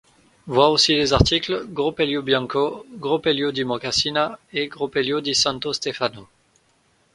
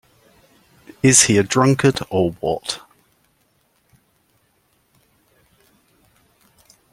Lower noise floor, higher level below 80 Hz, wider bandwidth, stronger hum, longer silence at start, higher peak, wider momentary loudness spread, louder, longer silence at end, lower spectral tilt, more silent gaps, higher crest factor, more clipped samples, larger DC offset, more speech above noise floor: about the same, -62 dBFS vs -63 dBFS; first, -40 dBFS vs -54 dBFS; second, 11.5 kHz vs 16 kHz; neither; second, 0.45 s vs 1.05 s; about the same, 0 dBFS vs 0 dBFS; second, 10 LU vs 13 LU; second, -21 LUFS vs -16 LUFS; second, 0.9 s vs 4.15 s; about the same, -4 dB/octave vs -4 dB/octave; neither; about the same, 22 dB vs 22 dB; neither; neither; second, 41 dB vs 47 dB